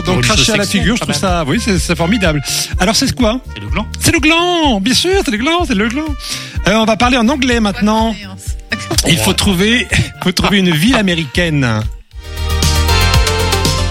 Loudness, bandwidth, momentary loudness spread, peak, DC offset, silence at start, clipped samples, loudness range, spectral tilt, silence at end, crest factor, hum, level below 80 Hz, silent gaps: -13 LUFS; 17 kHz; 9 LU; 0 dBFS; under 0.1%; 0 s; under 0.1%; 1 LU; -4 dB/octave; 0 s; 12 dB; none; -22 dBFS; none